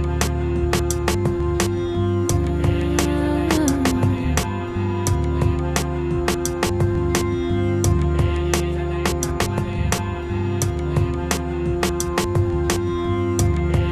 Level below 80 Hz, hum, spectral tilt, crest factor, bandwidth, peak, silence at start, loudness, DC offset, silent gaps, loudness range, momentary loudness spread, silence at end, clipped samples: -28 dBFS; none; -5.5 dB/octave; 18 dB; 14 kHz; -4 dBFS; 0 s; -21 LUFS; under 0.1%; none; 2 LU; 3 LU; 0 s; under 0.1%